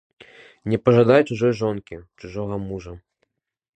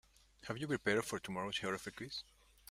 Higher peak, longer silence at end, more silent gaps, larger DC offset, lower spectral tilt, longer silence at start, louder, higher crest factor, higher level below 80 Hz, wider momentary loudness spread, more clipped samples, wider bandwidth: first, -2 dBFS vs -18 dBFS; first, 0.8 s vs 0.5 s; neither; neither; first, -8 dB/octave vs -4 dB/octave; first, 0.65 s vs 0.4 s; first, -20 LUFS vs -40 LUFS; about the same, 22 dB vs 24 dB; first, -50 dBFS vs -70 dBFS; first, 21 LU vs 12 LU; neither; second, 8.6 kHz vs 16 kHz